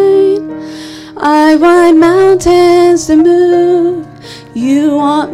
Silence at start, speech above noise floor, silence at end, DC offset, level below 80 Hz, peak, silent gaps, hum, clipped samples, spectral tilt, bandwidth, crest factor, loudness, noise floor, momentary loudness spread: 0 s; 21 dB; 0 s; under 0.1%; -40 dBFS; 0 dBFS; none; none; under 0.1%; -5 dB/octave; 12.5 kHz; 8 dB; -8 LUFS; -28 dBFS; 18 LU